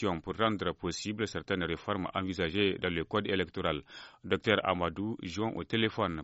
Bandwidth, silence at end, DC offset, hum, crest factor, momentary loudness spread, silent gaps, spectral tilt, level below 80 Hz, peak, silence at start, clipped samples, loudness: 8 kHz; 0 s; under 0.1%; none; 22 dB; 7 LU; none; -3.5 dB/octave; -56 dBFS; -10 dBFS; 0 s; under 0.1%; -33 LUFS